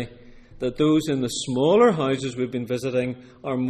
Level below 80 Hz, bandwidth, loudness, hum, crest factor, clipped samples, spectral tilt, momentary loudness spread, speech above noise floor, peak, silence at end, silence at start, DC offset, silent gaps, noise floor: -52 dBFS; 14.5 kHz; -23 LUFS; none; 16 dB; under 0.1%; -5.5 dB/octave; 13 LU; 23 dB; -8 dBFS; 0 s; 0 s; under 0.1%; none; -45 dBFS